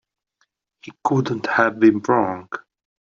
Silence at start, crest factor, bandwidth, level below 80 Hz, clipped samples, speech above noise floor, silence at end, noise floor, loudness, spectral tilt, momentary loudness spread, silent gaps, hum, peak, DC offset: 0.85 s; 18 dB; 7.4 kHz; -64 dBFS; under 0.1%; 50 dB; 0.45 s; -69 dBFS; -19 LUFS; -7 dB/octave; 16 LU; none; none; -2 dBFS; under 0.1%